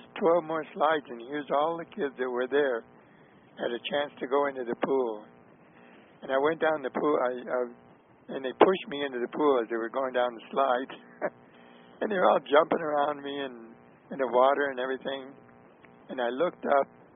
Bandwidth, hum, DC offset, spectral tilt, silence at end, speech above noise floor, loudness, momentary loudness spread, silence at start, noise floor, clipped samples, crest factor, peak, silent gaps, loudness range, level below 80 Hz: 3.9 kHz; none; under 0.1%; 0 dB/octave; 0.3 s; 29 dB; -29 LUFS; 13 LU; 0.15 s; -56 dBFS; under 0.1%; 26 dB; -4 dBFS; none; 4 LU; -76 dBFS